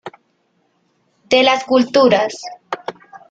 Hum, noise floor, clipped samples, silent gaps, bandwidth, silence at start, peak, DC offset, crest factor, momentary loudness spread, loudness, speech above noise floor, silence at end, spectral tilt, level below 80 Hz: none; -63 dBFS; under 0.1%; none; 9 kHz; 0.05 s; -2 dBFS; under 0.1%; 16 dB; 19 LU; -14 LUFS; 49 dB; 0.15 s; -4 dB/octave; -60 dBFS